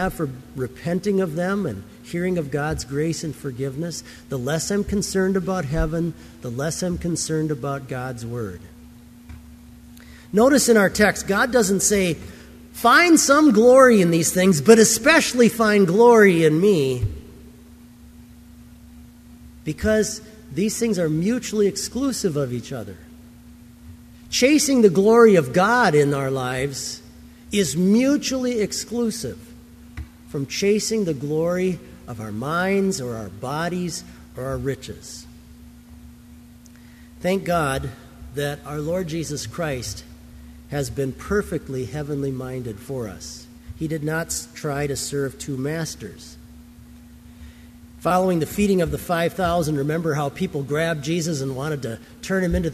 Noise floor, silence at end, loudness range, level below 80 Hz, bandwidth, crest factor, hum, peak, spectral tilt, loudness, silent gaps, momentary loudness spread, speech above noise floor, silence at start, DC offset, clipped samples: -45 dBFS; 0 s; 13 LU; -42 dBFS; 15.5 kHz; 20 dB; none; 0 dBFS; -4.5 dB/octave; -20 LUFS; none; 18 LU; 25 dB; 0 s; under 0.1%; under 0.1%